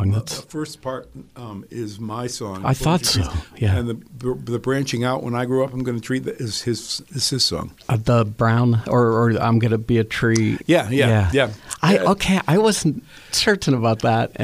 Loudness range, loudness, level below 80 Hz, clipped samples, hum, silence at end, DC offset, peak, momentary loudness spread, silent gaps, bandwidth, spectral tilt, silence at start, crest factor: 5 LU; -20 LUFS; -42 dBFS; under 0.1%; none; 0 s; under 0.1%; -2 dBFS; 12 LU; none; 15.5 kHz; -5 dB/octave; 0 s; 18 dB